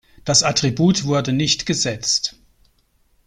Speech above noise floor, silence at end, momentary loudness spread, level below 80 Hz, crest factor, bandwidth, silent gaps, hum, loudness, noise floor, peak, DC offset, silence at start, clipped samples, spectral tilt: 42 dB; 0.95 s; 5 LU; -50 dBFS; 20 dB; 14 kHz; none; none; -18 LUFS; -61 dBFS; 0 dBFS; under 0.1%; 0.25 s; under 0.1%; -3.5 dB/octave